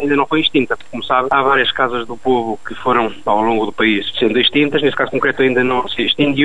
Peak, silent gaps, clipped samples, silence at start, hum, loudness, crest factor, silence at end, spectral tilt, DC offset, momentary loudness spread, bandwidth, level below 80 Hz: -2 dBFS; none; under 0.1%; 0 s; none; -15 LUFS; 14 dB; 0 s; -6 dB/octave; 3%; 5 LU; 10.5 kHz; -46 dBFS